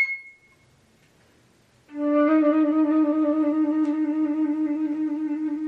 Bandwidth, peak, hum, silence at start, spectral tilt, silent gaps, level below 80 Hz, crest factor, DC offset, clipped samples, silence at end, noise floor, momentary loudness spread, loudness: 4.6 kHz; -10 dBFS; none; 0 s; -7 dB/octave; none; -74 dBFS; 14 dB; under 0.1%; under 0.1%; 0 s; -59 dBFS; 8 LU; -23 LUFS